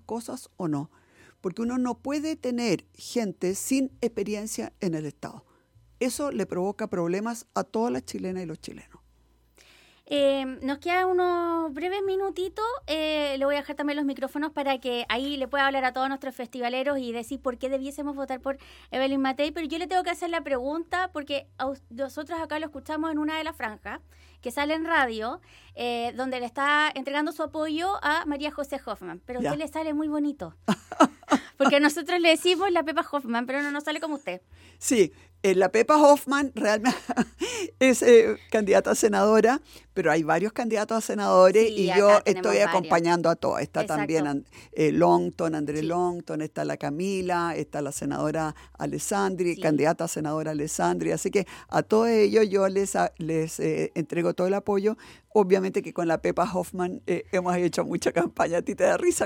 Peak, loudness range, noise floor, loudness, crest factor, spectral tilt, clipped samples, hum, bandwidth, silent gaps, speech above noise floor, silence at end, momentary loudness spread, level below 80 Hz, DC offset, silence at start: -6 dBFS; 9 LU; -62 dBFS; -26 LUFS; 20 dB; -4.5 dB/octave; under 0.1%; none; 17.5 kHz; none; 37 dB; 0 s; 13 LU; -58 dBFS; under 0.1%; 0.1 s